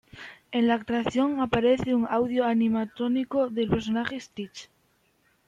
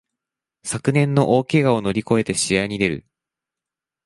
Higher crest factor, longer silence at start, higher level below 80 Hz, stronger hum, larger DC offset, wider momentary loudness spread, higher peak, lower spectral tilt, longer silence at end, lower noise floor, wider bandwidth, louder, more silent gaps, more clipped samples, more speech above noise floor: about the same, 16 dB vs 18 dB; second, 0.15 s vs 0.65 s; about the same, -54 dBFS vs -52 dBFS; neither; neither; first, 15 LU vs 8 LU; second, -10 dBFS vs -2 dBFS; about the same, -6.5 dB/octave vs -5.5 dB/octave; second, 0.85 s vs 1.05 s; second, -67 dBFS vs -88 dBFS; second, 7.6 kHz vs 11.5 kHz; second, -26 LUFS vs -19 LUFS; neither; neither; second, 42 dB vs 69 dB